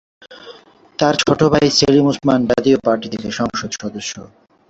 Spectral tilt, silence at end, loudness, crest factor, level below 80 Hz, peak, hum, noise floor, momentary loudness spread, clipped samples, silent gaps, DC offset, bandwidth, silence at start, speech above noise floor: -5 dB/octave; 0.45 s; -16 LUFS; 16 dB; -46 dBFS; -2 dBFS; none; -43 dBFS; 14 LU; under 0.1%; none; under 0.1%; 8 kHz; 0.3 s; 27 dB